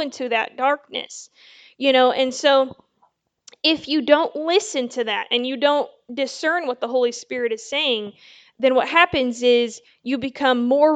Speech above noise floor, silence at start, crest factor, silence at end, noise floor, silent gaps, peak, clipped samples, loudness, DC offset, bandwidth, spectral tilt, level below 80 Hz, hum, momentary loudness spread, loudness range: 44 dB; 0 s; 20 dB; 0 s; -64 dBFS; none; 0 dBFS; under 0.1%; -20 LUFS; under 0.1%; 9.2 kHz; -2.5 dB/octave; -60 dBFS; none; 11 LU; 3 LU